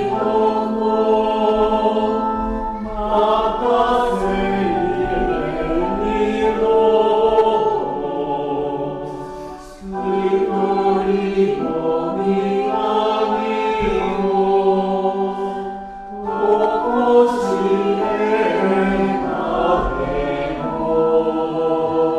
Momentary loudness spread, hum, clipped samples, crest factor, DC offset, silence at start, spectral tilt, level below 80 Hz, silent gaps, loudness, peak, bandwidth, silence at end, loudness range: 8 LU; none; under 0.1%; 16 dB; under 0.1%; 0 s; -7 dB/octave; -36 dBFS; none; -18 LUFS; -2 dBFS; 10.5 kHz; 0 s; 3 LU